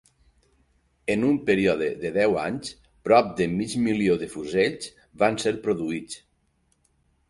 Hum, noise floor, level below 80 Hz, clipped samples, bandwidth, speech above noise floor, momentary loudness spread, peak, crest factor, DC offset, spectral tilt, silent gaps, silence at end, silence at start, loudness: none; -68 dBFS; -56 dBFS; under 0.1%; 11.5 kHz; 45 dB; 15 LU; -6 dBFS; 20 dB; under 0.1%; -5.5 dB/octave; none; 1.15 s; 1.05 s; -24 LUFS